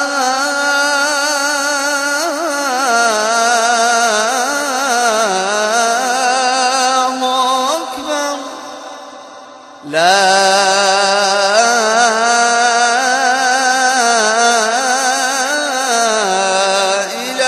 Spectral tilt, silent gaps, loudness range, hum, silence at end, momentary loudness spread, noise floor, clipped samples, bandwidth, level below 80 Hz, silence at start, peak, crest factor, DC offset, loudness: -0.5 dB/octave; none; 4 LU; none; 0 s; 6 LU; -35 dBFS; under 0.1%; 14 kHz; -66 dBFS; 0 s; 0 dBFS; 14 dB; under 0.1%; -13 LUFS